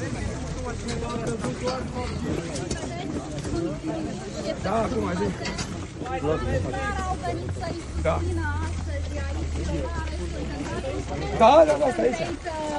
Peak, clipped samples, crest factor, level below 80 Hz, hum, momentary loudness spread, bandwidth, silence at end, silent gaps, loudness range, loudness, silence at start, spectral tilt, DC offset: -4 dBFS; under 0.1%; 22 dB; -38 dBFS; none; 9 LU; 11.5 kHz; 0 s; none; 7 LU; -27 LUFS; 0 s; -6 dB/octave; under 0.1%